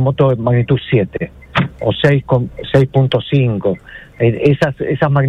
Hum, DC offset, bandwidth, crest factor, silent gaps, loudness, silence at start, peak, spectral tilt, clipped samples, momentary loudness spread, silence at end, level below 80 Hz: none; under 0.1%; 7 kHz; 14 dB; none; -15 LUFS; 0 s; 0 dBFS; -8.5 dB/octave; under 0.1%; 6 LU; 0 s; -40 dBFS